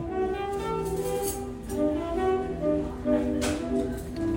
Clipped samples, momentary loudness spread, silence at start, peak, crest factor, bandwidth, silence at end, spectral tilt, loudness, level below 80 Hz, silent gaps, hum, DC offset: under 0.1%; 5 LU; 0 s; -12 dBFS; 16 dB; 16.5 kHz; 0 s; -6 dB/octave; -29 LUFS; -42 dBFS; none; none; under 0.1%